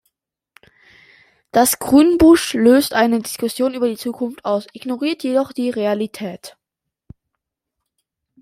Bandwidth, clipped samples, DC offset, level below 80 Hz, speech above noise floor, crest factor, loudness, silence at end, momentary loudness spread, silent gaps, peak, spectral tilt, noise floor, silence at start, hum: 16 kHz; under 0.1%; under 0.1%; -46 dBFS; 64 dB; 18 dB; -17 LUFS; 1.95 s; 13 LU; none; -2 dBFS; -4 dB/octave; -80 dBFS; 1.55 s; none